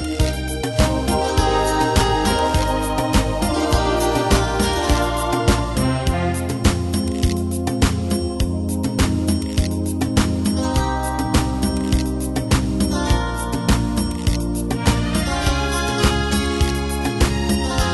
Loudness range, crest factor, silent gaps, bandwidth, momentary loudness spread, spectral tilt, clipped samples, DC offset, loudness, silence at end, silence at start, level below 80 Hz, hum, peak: 2 LU; 18 dB; none; 12.5 kHz; 4 LU; -5 dB/octave; under 0.1%; under 0.1%; -20 LUFS; 0 s; 0 s; -24 dBFS; none; -2 dBFS